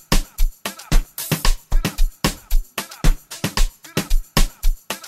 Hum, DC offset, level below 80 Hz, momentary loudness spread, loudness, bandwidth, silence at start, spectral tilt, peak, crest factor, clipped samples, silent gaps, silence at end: none; under 0.1%; -20 dBFS; 6 LU; -24 LUFS; 16 kHz; 0.1 s; -3.5 dB/octave; -2 dBFS; 16 dB; under 0.1%; none; 0 s